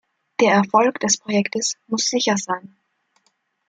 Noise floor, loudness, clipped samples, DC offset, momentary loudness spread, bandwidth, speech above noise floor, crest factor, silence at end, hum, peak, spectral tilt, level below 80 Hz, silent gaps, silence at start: -68 dBFS; -19 LUFS; under 0.1%; under 0.1%; 10 LU; 9.4 kHz; 48 dB; 20 dB; 1.1 s; none; -2 dBFS; -3 dB/octave; -68 dBFS; none; 0.4 s